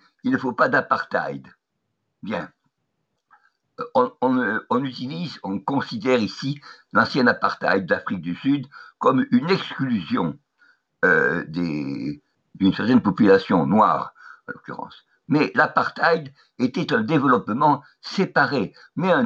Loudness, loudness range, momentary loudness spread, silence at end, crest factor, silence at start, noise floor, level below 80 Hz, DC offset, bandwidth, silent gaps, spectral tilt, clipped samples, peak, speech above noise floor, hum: -21 LUFS; 6 LU; 17 LU; 0 s; 18 dB; 0.25 s; -77 dBFS; -66 dBFS; under 0.1%; 7.4 kHz; none; -7 dB/octave; under 0.1%; -4 dBFS; 55 dB; none